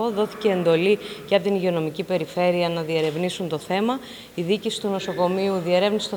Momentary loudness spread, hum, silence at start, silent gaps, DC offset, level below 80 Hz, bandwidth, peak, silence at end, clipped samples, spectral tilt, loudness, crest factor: 6 LU; none; 0 s; none; under 0.1%; -62 dBFS; over 20 kHz; -4 dBFS; 0 s; under 0.1%; -5.5 dB/octave; -23 LUFS; 18 dB